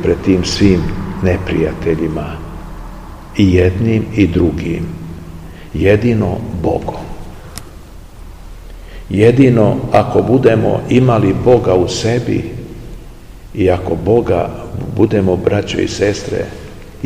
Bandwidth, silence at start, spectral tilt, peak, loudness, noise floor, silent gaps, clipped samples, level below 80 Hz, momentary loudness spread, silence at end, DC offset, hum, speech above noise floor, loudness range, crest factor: 15.5 kHz; 0 s; -7 dB/octave; 0 dBFS; -14 LUFS; -33 dBFS; none; 0.2%; -30 dBFS; 21 LU; 0 s; 0.7%; none; 21 dB; 7 LU; 14 dB